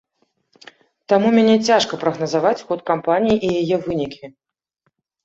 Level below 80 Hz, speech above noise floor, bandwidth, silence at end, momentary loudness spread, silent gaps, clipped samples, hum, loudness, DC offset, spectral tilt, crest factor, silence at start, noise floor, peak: -54 dBFS; 53 dB; 7.8 kHz; 0.95 s; 10 LU; none; under 0.1%; none; -18 LUFS; under 0.1%; -5.5 dB/octave; 16 dB; 1.1 s; -70 dBFS; -2 dBFS